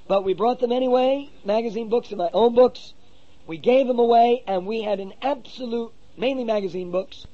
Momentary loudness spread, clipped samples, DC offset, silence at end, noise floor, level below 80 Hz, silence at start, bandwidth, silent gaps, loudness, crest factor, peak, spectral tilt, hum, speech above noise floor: 12 LU; under 0.1%; 0.8%; 0.1 s; -54 dBFS; -58 dBFS; 0.1 s; 7 kHz; none; -22 LUFS; 16 dB; -6 dBFS; -6.5 dB/octave; none; 33 dB